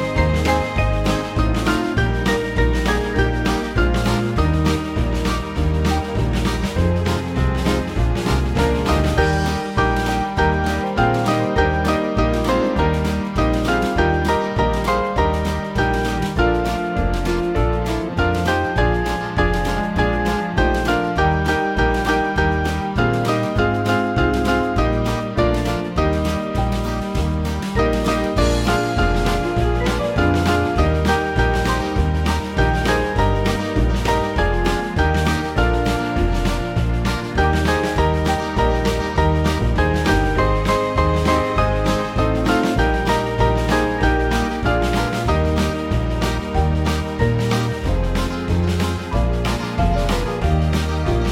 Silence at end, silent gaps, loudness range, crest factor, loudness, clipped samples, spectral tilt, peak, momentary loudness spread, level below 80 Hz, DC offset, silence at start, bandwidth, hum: 0 s; none; 2 LU; 16 dB; -19 LUFS; under 0.1%; -6 dB/octave; -2 dBFS; 4 LU; -24 dBFS; under 0.1%; 0 s; 16 kHz; none